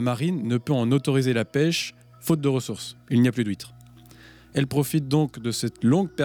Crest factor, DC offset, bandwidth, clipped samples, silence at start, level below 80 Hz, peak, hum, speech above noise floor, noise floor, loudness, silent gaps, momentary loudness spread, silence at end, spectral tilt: 16 dB; under 0.1%; 19.5 kHz; under 0.1%; 0 s; -60 dBFS; -8 dBFS; 60 Hz at -45 dBFS; 26 dB; -49 dBFS; -24 LUFS; none; 11 LU; 0 s; -6 dB/octave